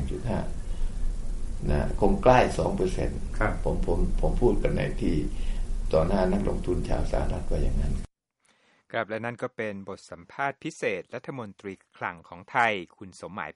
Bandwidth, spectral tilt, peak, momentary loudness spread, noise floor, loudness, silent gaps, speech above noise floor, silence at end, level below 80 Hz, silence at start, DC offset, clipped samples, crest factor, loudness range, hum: 11.5 kHz; -6.5 dB/octave; -6 dBFS; 14 LU; -69 dBFS; -29 LUFS; none; 43 dB; 0.05 s; -30 dBFS; 0 s; under 0.1%; under 0.1%; 20 dB; 8 LU; none